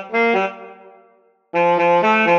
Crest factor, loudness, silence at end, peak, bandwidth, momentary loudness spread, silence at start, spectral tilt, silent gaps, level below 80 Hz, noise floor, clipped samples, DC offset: 14 dB; -17 LUFS; 0 s; -4 dBFS; 7.4 kHz; 11 LU; 0 s; -6 dB/octave; none; -76 dBFS; -56 dBFS; under 0.1%; under 0.1%